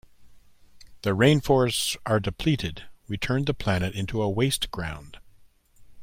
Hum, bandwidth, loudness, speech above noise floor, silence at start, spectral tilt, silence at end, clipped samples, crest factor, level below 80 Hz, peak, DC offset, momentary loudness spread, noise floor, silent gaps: none; 16.5 kHz; -25 LUFS; 31 dB; 0.2 s; -5 dB/octave; 0 s; under 0.1%; 22 dB; -46 dBFS; -6 dBFS; under 0.1%; 14 LU; -56 dBFS; none